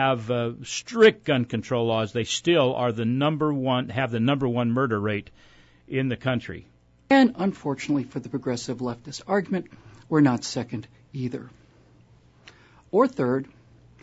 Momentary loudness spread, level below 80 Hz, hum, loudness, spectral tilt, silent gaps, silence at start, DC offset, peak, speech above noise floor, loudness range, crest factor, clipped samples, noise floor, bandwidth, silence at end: 13 LU; -60 dBFS; none; -24 LUFS; -5.5 dB/octave; none; 0 s; under 0.1%; -6 dBFS; 32 dB; 6 LU; 20 dB; under 0.1%; -55 dBFS; 8 kHz; 0.55 s